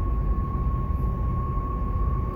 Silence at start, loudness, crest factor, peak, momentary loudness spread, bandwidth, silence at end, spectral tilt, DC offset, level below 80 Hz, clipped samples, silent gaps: 0 s; -28 LUFS; 10 dB; -14 dBFS; 2 LU; 3 kHz; 0 s; -11 dB/octave; under 0.1%; -26 dBFS; under 0.1%; none